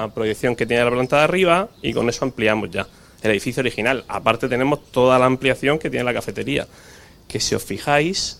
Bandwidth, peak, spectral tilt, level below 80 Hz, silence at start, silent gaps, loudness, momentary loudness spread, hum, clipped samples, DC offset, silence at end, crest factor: 16.5 kHz; 0 dBFS; -4.5 dB/octave; -46 dBFS; 0 s; none; -20 LUFS; 9 LU; none; under 0.1%; under 0.1%; 0.05 s; 20 dB